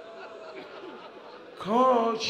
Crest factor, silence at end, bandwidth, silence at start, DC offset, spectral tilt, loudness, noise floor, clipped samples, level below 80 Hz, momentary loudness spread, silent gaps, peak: 16 dB; 0 s; 10.5 kHz; 0 s; under 0.1%; -4.5 dB/octave; -25 LUFS; -46 dBFS; under 0.1%; -76 dBFS; 23 LU; none; -12 dBFS